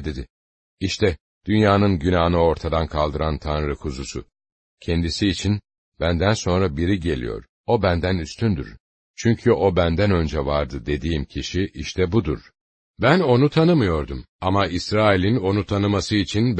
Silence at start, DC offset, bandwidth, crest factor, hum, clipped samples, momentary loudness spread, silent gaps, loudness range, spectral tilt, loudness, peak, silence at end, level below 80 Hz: 0 s; under 0.1%; 8.6 kHz; 18 dB; none; under 0.1%; 11 LU; 0.30-0.77 s, 1.20-1.41 s, 4.52-4.78 s, 5.78-5.92 s, 7.49-7.64 s, 8.80-9.14 s, 12.61-12.94 s, 14.29-14.39 s; 4 LU; -6.5 dB/octave; -21 LUFS; -2 dBFS; 0 s; -36 dBFS